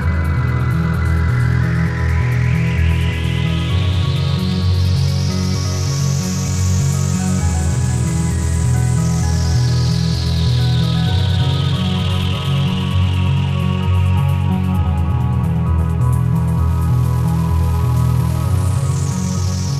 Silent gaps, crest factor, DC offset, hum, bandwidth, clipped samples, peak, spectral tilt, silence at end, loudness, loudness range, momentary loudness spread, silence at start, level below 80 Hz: none; 10 dB; under 0.1%; none; 14 kHz; under 0.1%; -4 dBFS; -6 dB/octave; 0 s; -17 LUFS; 1 LU; 2 LU; 0 s; -26 dBFS